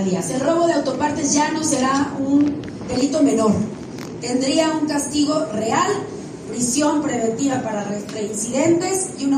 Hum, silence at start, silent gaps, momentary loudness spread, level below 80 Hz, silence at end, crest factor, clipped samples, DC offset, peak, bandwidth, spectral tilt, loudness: none; 0 s; none; 9 LU; -54 dBFS; 0 s; 14 dB; under 0.1%; under 0.1%; -4 dBFS; 14.5 kHz; -4 dB/octave; -20 LUFS